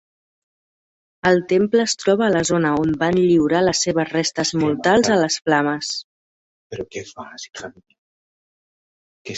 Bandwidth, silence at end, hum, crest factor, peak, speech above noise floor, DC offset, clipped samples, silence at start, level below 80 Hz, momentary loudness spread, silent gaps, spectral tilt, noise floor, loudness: 8.2 kHz; 0 s; none; 18 dB; -2 dBFS; over 71 dB; under 0.1%; under 0.1%; 1.25 s; -54 dBFS; 18 LU; 6.04-6.70 s, 7.98-9.25 s; -4.5 dB/octave; under -90 dBFS; -18 LUFS